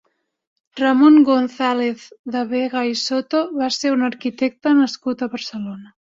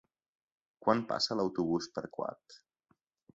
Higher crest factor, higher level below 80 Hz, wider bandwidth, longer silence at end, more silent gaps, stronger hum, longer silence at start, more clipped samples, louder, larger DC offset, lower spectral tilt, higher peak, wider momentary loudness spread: second, 16 dB vs 24 dB; first, -66 dBFS vs -72 dBFS; about the same, 7.8 kHz vs 7.8 kHz; second, 0.3 s vs 0.75 s; first, 2.19-2.24 s vs none; neither; about the same, 0.75 s vs 0.8 s; neither; first, -18 LUFS vs -34 LUFS; neither; about the same, -4 dB/octave vs -5 dB/octave; first, -2 dBFS vs -12 dBFS; first, 15 LU vs 10 LU